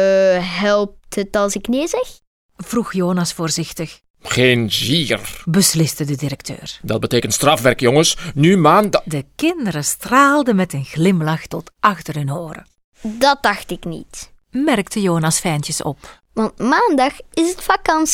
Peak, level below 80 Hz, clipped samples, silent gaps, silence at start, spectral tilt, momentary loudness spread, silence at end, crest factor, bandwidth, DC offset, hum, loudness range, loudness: 0 dBFS; -44 dBFS; under 0.1%; 2.27-2.49 s, 4.10-4.14 s, 12.84-12.92 s; 0 s; -4.5 dB/octave; 15 LU; 0 s; 18 dB; 18 kHz; under 0.1%; none; 5 LU; -17 LUFS